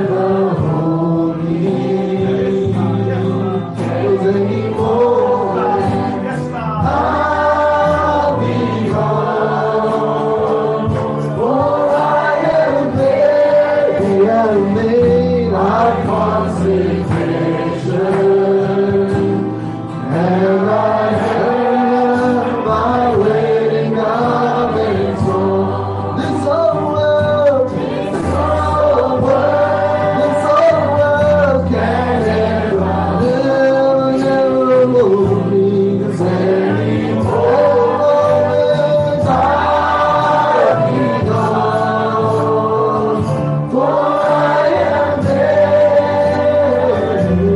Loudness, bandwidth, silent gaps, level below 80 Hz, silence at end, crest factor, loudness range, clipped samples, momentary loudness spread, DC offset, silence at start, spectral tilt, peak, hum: -14 LUFS; 11.5 kHz; none; -40 dBFS; 0 s; 12 dB; 3 LU; under 0.1%; 5 LU; under 0.1%; 0 s; -8 dB/octave; -2 dBFS; none